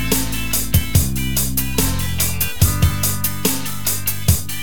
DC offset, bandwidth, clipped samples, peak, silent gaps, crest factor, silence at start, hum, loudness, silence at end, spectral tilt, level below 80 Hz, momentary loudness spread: 6%; 17.5 kHz; under 0.1%; 0 dBFS; none; 18 dB; 0 s; none; -18 LUFS; 0 s; -3.5 dB/octave; -28 dBFS; 3 LU